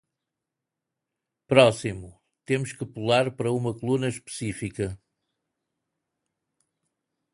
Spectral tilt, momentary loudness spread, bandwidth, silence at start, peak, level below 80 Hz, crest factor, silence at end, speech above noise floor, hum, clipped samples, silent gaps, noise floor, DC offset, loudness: -5.5 dB/octave; 15 LU; 11.5 kHz; 1.5 s; -2 dBFS; -58 dBFS; 26 dB; 2.35 s; 61 dB; none; under 0.1%; none; -86 dBFS; under 0.1%; -25 LUFS